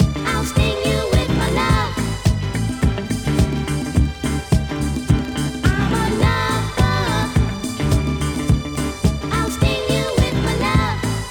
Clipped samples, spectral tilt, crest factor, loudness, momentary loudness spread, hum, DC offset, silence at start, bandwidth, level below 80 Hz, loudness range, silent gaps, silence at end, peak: under 0.1%; -5.5 dB/octave; 18 dB; -19 LUFS; 5 LU; none; under 0.1%; 0 s; 19.5 kHz; -26 dBFS; 1 LU; none; 0 s; -2 dBFS